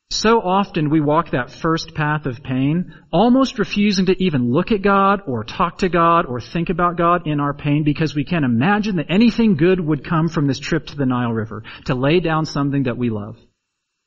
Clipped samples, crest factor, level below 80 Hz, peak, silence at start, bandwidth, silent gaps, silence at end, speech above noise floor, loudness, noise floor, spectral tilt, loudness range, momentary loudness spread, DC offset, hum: under 0.1%; 16 dB; -40 dBFS; -2 dBFS; 0.1 s; 7.6 kHz; none; 0.7 s; 58 dB; -18 LUFS; -76 dBFS; -5.5 dB/octave; 3 LU; 8 LU; under 0.1%; none